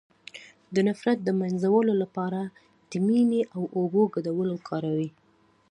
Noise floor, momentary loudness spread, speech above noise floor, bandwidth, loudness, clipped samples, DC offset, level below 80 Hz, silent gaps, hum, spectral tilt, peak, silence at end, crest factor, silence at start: -63 dBFS; 14 LU; 38 dB; 10.5 kHz; -26 LUFS; under 0.1%; under 0.1%; -74 dBFS; none; none; -8 dB/octave; -10 dBFS; 0.6 s; 16 dB; 0.35 s